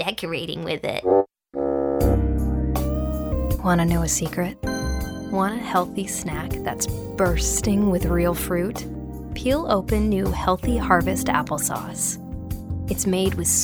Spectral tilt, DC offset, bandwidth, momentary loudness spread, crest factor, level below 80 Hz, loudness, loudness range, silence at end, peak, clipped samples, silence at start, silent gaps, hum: -5 dB/octave; under 0.1%; over 20 kHz; 8 LU; 20 dB; -30 dBFS; -23 LUFS; 2 LU; 0 s; -2 dBFS; under 0.1%; 0 s; none; none